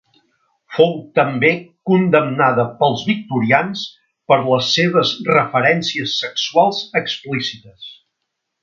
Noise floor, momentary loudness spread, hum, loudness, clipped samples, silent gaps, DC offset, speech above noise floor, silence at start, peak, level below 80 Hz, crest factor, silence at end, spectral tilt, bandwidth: -76 dBFS; 11 LU; none; -16 LUFS; under 0.1%; none; under 0.1%; 59 dB; 0.7 s; 0 dBFS; -62 dBFS; 18 dB; 0.7 s; -5 dB/octave; 7.4 kHz